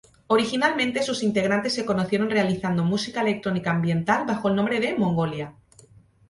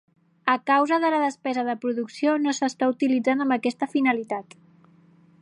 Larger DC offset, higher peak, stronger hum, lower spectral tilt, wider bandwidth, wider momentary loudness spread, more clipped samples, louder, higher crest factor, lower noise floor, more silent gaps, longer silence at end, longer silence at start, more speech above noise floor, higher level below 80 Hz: neither; about the same, -6 dBFS vs -4 dBFS; neither; first, -5.5 dB/octave vs -4 dB/octave; about the same, 11.5 kHz vs 10.5 kHz; second, 3 LU vs 7 LU; neither; about the same, -23 LUFS vs -24 LUFS; about the same, 18 dB vs 20 dB; about the same, -53 dBFS vs -56 dBFS; neither; second, 0.8 s vs 1 s; second, 0.3 s vs 0.45 s; about the same, 30 dB vs 32 dB; first, -58 dBFS vs -80 dBFS